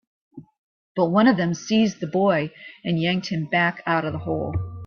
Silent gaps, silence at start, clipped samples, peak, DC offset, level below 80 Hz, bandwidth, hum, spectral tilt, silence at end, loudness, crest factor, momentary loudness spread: 0.58-0.95 s; 0.35 s; under 0.1%; -6 dBFS; under 0.1%; -52 dBFS; 7 kHz; none; -6 dB/octave; 0 s; -22 LUFS; 18 dB; 9 LU